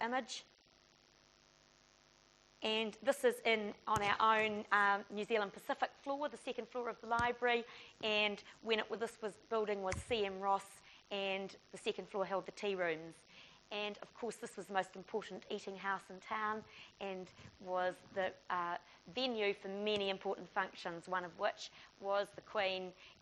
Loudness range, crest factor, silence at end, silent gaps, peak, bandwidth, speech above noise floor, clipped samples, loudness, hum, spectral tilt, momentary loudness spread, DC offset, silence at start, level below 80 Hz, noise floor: 8 LU; 22 dB; 0.1 s; none; -18 dBFS; 11.5 kHz; 29 dB; under 0.1%; -39 LUFS; none; -3.5 dB/octave; 13 LU; under 0.1%; 0 s; -70 dBFS; -69 dBFS